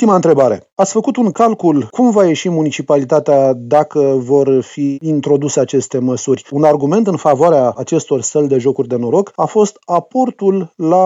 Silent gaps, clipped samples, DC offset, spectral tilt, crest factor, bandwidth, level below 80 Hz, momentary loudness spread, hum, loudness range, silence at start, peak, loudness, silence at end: 0.72-0.76 s; under 0.1%; under 0.1%; -6 dB/octave; 12 dB; 8 kHz; -62 dBFS; 6 LU; none; 1 LU; 0 s; 0 dBFS; -13 LUFS; 0 s